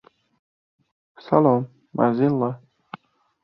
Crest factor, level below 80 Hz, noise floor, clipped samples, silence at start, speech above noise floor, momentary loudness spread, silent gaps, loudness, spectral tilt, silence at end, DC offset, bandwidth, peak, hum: 22 dB; -64 dBFS; -44 dBFS; under 0.1%; 1.25 s; 24 dB; 24 LU; none; -21 LUFS; -11.5 dB/octave; 0.85 s; under 0.1%; 5.8 kHz; -2 dBFS; none